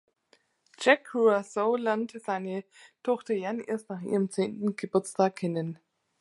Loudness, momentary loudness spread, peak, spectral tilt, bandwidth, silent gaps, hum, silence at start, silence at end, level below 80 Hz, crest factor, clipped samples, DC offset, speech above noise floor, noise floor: -29 LUFS; 11 LU; -8 dBFS; -5.5 dB/octave; 11.5 kHz; none; none; 0.8 s; 0.45 s; -80 dBFS; 22 dB; under 0.1%; under 0.1%; 39 dB; -67 dBFS